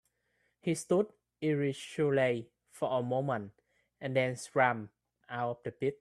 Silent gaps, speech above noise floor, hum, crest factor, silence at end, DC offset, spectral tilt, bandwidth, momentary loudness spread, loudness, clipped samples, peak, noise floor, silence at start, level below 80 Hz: none; 45 dB; none; 22 dB; 0.05 s; under 0.1%; -6 dB/octave; 13 kHz; 11 LU; -33 LUFS; under 0.1%; -12 dBFS; -77 dBFS; 0.65 s; -74 dBFS